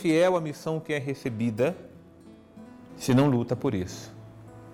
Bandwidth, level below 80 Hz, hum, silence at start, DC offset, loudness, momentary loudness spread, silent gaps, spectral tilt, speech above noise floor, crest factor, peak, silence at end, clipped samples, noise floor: 16.5 kHz; -60 dBFS; none; 0 s; under 0.1%; -27 LUFS; 25 LU; none; -6.5 dB/octave; 25 dB; 14 dB; -14 dBFS; 0 s; under 0.1%; -51 dBFS